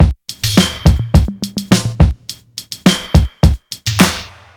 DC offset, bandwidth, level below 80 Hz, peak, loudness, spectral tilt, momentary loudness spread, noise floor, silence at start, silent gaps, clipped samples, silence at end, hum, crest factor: under 0.1%; over 20 kHz; -20 dBFS; 0 dBFS; -14 LUFS; -5 dB/octave; 14 LU; -32 dBFS; 0 s; none; 0.2%; 0.3 s; none; 14 dB